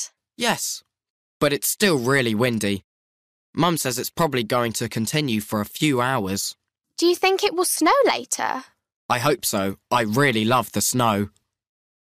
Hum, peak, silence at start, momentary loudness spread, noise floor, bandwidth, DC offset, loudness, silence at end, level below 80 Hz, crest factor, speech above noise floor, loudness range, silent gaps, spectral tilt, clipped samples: none; -6 dBFS; 0 s; 9 LU; under -90 dBFS; 15.5 kHz; under 0.1%; -21 LUFS; 0.8 s; -58 dBFS; 16 dB; over 69 dB; 2 LU; 1.10-1.40 s, 2.84-3.53 s, 8.96-9.09 s; -4 dB/octave; under 0.1%